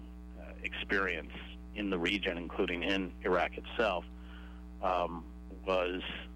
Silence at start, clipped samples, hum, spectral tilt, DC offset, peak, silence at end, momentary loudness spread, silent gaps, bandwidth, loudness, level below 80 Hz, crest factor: 0 s; under 0.1%; none; -5.5 dB/octave; under 0.1%; -20 dBFS; 0 s; 17 LU; none; 15.5 kHz; -34 LUFS; -48 dBFS; 16 dB